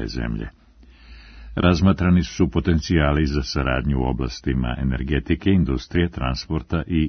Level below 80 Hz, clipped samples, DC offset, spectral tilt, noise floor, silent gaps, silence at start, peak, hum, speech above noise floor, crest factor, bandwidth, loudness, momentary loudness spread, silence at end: -30 dBFS; under 0.1%; under 0.1%; -7 dB/octave; -46 dBFS; none; 0 s; -2 dBFS; none; 26 dB; 20 dB; 6.6 kHz; -22 LUFS; 9 LU; 0 s